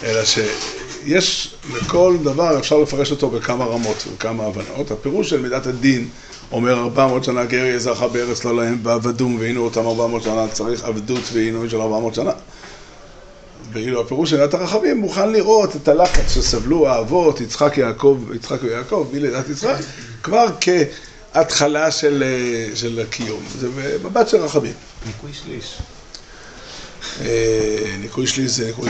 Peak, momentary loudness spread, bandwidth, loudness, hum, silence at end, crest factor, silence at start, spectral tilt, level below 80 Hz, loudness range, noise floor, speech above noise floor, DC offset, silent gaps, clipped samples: -2 dBFS; 15 LU; 9 kHz; -18 LUFS; none; 0 s; 16 dB; 0 s; -4.5 dB/octave; -34 dBFS; 7 LU; -40 dBFS; 23 dB; under 0.1%; none; under 0.1%